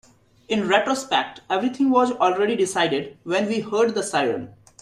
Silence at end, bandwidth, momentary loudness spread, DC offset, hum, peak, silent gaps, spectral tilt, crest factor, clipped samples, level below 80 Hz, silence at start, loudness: 0.3 s; 13.5 kHz; 7 LU; under 0.1%; none; -4 dBFS; none; -4 dB/octave; 18 dB; under 0.1%; -64 dBFS; 0.5 s; -22 LUFS